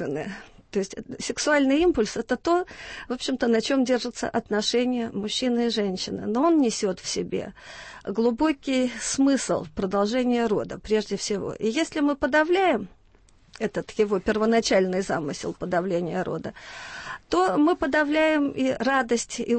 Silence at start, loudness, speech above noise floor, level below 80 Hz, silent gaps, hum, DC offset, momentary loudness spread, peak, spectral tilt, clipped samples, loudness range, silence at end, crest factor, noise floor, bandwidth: 0 s; -24 LUFS; 32 dB; -52 dBFS; none; none; under 0.1%; 12 LU; -10 dBFS; -4 dB/octave; under 0.1%; 2 LU; 0 s; 16 dB; -56 dBFS; 8.8 kHz